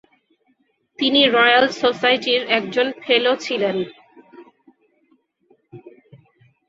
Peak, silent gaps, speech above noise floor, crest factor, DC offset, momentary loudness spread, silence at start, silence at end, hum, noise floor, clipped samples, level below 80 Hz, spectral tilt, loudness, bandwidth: -2 dBFS; none; 47 dB; 20 dB; under 0.1%; 9 LU; 1 s; 0.8 s; none; -65 dBFS; under 0.1%; -68 dBFS; -3.5 dB/octave; -17 LUFS; 7.8 kHz